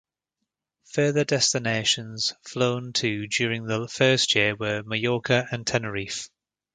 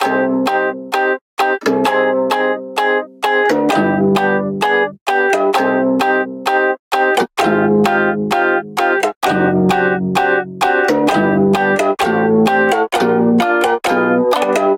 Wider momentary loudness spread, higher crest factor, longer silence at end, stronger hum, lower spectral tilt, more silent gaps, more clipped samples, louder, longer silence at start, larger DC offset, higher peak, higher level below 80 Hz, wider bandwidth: first, 9 LU vs 4 LU; first, 22 dB vs 12 dB; first, 0.5 s vs 0 s; neither; second, -3.5 dB/octave vs -5.5 dB/octave; second, none vs 1.21-1.37 s, 5.01-5.06 s, 6.79-6.91 s, 9.16-9.21 s; neither; second, -24 LUFS vs -14 LUFS; first, 0.9 s vs 0 s; neither; about the same, -4 dBFS vs -2 dBFS; second, -60 dBFS vs -54 dBFS; second, 9.6 kHz vs 17 kHz